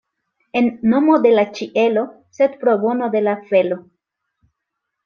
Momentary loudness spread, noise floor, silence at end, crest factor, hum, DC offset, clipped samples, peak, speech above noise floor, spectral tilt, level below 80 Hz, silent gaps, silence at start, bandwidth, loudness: 9 LU; -78 dBFS; 1.25 s; 16 dB; none; under 0.1%; under 0.1%; -2 dBFS; 62 dB; -7 dB/octave; -64 dBFS; none; 0.55 s; 6.8 kHz; -17 LUFS